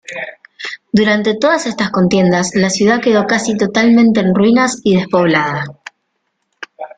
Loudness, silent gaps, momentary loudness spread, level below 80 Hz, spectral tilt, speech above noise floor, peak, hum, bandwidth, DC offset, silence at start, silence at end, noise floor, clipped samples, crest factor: -13 LUFS; none; 16 LU; -50 dBFS; -5 dB/octave; 56 dB; 0 dBFS; none; 9.4 kHz; under 0.1%; 0.1 s; 0.1 s; -68 dBFS; under 0.1%; 14 dB